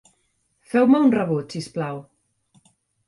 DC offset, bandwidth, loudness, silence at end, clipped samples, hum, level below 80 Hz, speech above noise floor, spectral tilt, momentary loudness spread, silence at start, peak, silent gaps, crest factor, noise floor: under 0.1%; 11.5 kHz; -21 LUFS; 1.05 s; under 0.1%; none; -66 dBFS; 49 dB; -7 dB/octave; 15 LU; 0.75 s; -4 dBFS; none; 18 dB; -69 dBFS